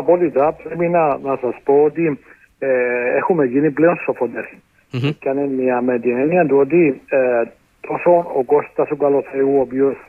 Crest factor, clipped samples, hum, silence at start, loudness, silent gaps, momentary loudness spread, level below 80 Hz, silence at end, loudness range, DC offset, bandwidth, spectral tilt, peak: 14 dB; under 0.1%; none; 0 s; -17 LUFS; none; 8 LU; -58 dBFS; 0.05 s; 2 LU; under 0.1%; 4.7 kHz; -9.5 dB/octave; -2 dBFS